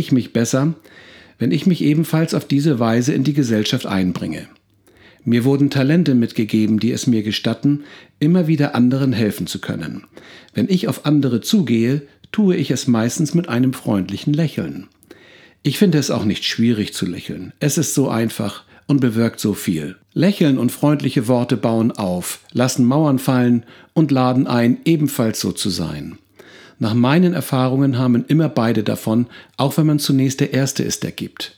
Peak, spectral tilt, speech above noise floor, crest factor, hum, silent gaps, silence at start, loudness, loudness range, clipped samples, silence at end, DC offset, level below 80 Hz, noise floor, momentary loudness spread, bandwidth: 0 dBFS; -6 dB/octave; 34 dB; 18 dB; none; none; 0 s; -18 LUFS; 3 LU; under 0.1%; 0.1 s; under 0.1%; -56 dBFS; -51 dBFS; 9 LU; 19.5 kHz